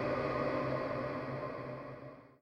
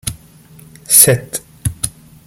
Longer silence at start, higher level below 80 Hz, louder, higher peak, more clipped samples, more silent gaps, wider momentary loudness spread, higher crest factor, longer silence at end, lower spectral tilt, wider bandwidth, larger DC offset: about the same, 0 s vs 0.05 s; second, -62 dBFS vs -40 dBFS; second, -38 LUFS vs -11 LUFS; second, -22 dBFS vs 0 dBFS; second, under 0.1% vs 0.4%; neither; second, 13 LU vs 18 LU; about the same, 16 dB vs 16 dB; second, 0.15 s vs 0.35 s; first, -8 dB/octave vs -2.5 dB/octave; second, 9.8 kHz vs over 20 kHz; neither